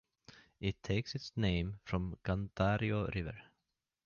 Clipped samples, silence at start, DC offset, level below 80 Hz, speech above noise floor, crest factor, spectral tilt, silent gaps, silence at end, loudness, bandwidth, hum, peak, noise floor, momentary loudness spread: under 0.1%; 0.35 s; under 0.1%; -50 dBFS; 51 dB; 18 dB; -7 dB/octave; none; 0.65 s; -37 LUFS; 7 kHz; none; -20 dBFS; -87 dBFS; 8 LU